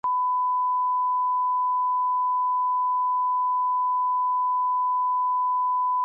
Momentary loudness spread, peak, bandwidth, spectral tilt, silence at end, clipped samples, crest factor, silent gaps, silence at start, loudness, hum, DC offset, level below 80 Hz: 0 LU; -20 dBFS; 1.5 kHz; -5 dB/octave; 0 s; under 0.1%; 4 dB; none; 0.05 s; -23 LUFS; 50 Hz at -105 dBFS; under 0.1%; -84 dBFS